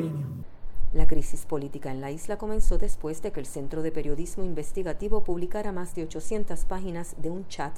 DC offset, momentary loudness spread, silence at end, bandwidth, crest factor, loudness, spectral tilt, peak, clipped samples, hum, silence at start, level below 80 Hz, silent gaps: under 0.1%; 5 LU; 0 s; 11.5 kHz; 16 dB; -33 LUFS; -6 dB/octave; -6 dBFS; under 0.1%; none; 0 s; -30 dBFS; none